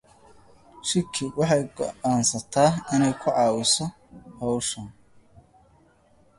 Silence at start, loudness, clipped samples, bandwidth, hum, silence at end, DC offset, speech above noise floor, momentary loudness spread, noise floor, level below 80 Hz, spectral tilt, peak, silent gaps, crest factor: 0.75 s; -24 LUFS; under 0.1%; 11.5 kHz; none; 1.45 s; under 0.1%; 35 dB; 11 LU; -59 dBFS; -58 dBFS; -4 dB/octave; -6 dBFS; none; 20 dB